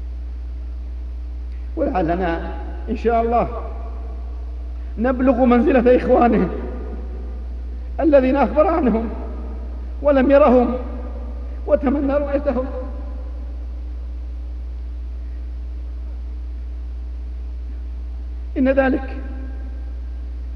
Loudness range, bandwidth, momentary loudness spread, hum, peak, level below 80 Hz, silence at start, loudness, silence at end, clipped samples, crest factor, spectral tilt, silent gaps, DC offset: 13 LU; 5.6 kHz; 17 LU; none; -2 dBFS; -28 dBFS; 0 s; -21 LUFS; 0 s; under 0.1%; 18 dB; -9.5 dB/octave; none; under 0.1%